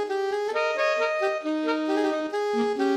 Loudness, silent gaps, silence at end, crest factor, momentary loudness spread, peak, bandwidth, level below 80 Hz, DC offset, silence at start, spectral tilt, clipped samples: -26 LUFS; none; 0 s; 12 dB; 3 LU; -12 dBFS; 12.5 kHz; -76 dBFS; under 0.1%; 0 s; -3.5 dB/octave; under 0.1%